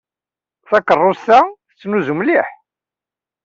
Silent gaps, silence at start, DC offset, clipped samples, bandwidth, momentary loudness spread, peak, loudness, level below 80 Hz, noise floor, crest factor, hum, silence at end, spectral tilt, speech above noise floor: none; 0.7 s; under 0.1%; under 0.1%; 7.6 kHz; 9 LU; -2 dBFS; -15 LUFS; -62 dBFS; -90 dBFS; 16 dB; none; 0.95 s; -6.5 dB/octave; 76 dB